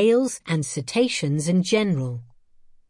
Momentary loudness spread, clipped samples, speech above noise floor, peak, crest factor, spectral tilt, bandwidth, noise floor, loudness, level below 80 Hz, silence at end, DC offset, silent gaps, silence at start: 7 LU; under 0.1%; 30 dB; -8 dBFS; 14 dB; -5.5 dB/octave; 11.5 kHz; -52 dBFS; -23 LUFS; -62 dBFS; 0.65 s; under 0.1%; none; 0 s